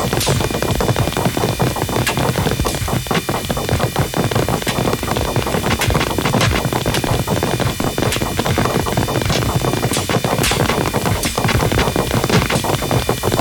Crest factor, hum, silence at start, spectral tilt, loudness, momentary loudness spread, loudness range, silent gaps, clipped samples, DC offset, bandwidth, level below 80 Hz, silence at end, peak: 14 dB; none; 0 s; -4.5 dB/octave; -17 LUFS; 3 LU; 2 LU; none; under 0.1%; under 0.1%; 19 kHz; -30 dBFS; 0 s; -4 dBFS